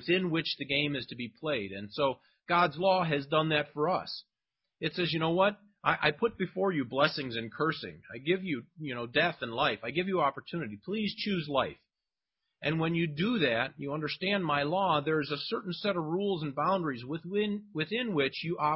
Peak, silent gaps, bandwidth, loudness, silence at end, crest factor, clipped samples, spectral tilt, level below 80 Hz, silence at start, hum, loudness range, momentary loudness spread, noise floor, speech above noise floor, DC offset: -10 dBFS; none; 5.8 kHz; -31 LUFS; 0 s; 22 dB; under 0.1%; -9.5 dB/octave; -66 dBFS; 0 s; none; 2 LU; 9 LU; under -90 dBFS; over 59 dB; under 0.1%